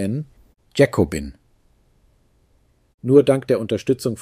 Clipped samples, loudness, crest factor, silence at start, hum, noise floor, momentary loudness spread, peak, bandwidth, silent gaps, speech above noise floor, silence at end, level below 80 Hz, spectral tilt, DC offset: under 0.1%; -19 LUFS; 20 dB; 0 s; none; -60 dBFS; 16 LU; 0 dBFS; 15.5 kHz; 2.94-2.98 s; 42 dB; 0 s; -46 dBFS; -6.5 dB/octave; under 0.1%